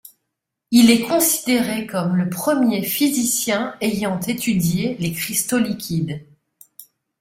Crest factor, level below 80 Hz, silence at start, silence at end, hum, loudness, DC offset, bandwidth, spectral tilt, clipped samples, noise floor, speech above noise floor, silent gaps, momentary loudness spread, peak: 18 dB; -56 dBFS; 0.7 s; 0.4 s; none; -19 LUFS; under 0.1%; 16 kHz; -4 dB/octave; under 0.1%; -79 dBFS; 60 dB; none; 9 LU; -2 dBFS